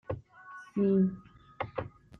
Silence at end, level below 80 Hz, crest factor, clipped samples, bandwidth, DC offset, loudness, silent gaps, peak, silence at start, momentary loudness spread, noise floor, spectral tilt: 0.3 s; -62 dBFS; 16 dB; under 0.1%; 4.2 kHz; under 0.1%; -32 LUFS; none; -18 dBFS; 0.1 s; 22 LU; -51 dBFS; -10 dB/octave